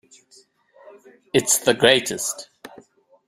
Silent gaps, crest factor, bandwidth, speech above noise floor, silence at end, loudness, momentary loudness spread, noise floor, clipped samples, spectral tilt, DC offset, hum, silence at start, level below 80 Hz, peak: none; 22 dB; 16 kHz; 36 dB; 0.6 s; -19 LUFS; 15 LU; -56 dBFS; under 0.1%; -2 dB/octave; under 0.1%; none; 1.35 s; -62 dBFS; 0 dBFS